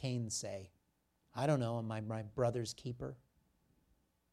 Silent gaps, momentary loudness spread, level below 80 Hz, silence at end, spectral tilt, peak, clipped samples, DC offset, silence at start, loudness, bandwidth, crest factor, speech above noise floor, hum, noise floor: none; 14 LU; -68 dBFS; 1.15 s; -5.5 dB/octave; -20 dBFS; under 0.1%; under 0.1%; 0 s; -39 LUFS; 13 kHz; 20 dB; 41 dB; none; -79 dBFS